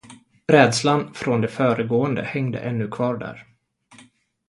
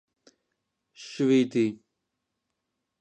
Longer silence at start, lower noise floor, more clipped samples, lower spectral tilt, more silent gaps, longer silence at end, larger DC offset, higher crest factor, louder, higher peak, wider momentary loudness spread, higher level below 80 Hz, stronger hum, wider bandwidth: second, 0.1 s vs 1 s; second, -54 dBFS vs -82 dBFS; neither; about the same, -5.5 dB/octave vs -6 dB/octave; neither; second, 1.05 s vs 1.25 s; neither; about the same, 22 dB vs 18 dB; first, -21 LUFS vs -25 LUFS; first, 0 dBFS vs -12 dBFS; second, 11 LU vs 23 LU; first, -60 dBFS vs -78 dBFS; neither; first, 11.5 kHz vs 8.8 kHz